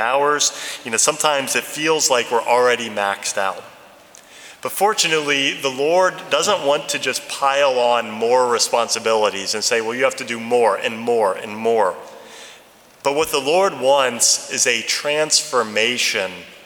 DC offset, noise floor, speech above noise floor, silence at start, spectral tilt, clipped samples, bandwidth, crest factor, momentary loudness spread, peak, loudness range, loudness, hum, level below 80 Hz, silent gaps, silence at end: under 0.1%; -47 dBFS; 29 dB; 0 s; -1 dB/octave; under 0.1%; over 20 kHz; 18 dB; 7 LU; 0 dBFS; 3 LU; -18 LUFS; none; -66 dBFS; none; 0.1 s